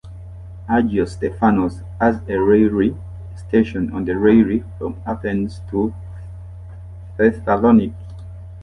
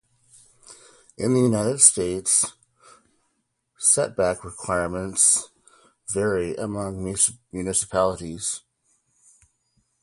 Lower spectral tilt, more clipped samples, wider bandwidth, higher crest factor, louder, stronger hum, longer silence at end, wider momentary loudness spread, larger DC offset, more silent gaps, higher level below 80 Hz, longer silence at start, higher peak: first, -9 dB/octave vs -3.5 dB/octave; neither; second, 9.8 kHz vs 12 kHz; second, 16 dB vs 26 dB; first, -18 LUFS vs -21 LUFS; neither; second, 0 s vs 1.45 s; first, 22 LU vs 14 LU; neither; neither; first, -36 dBFS vs -52 dBFS; second, 0.05 s vs 0.7 s; about the same, -2 dBFS vs 0 dBFS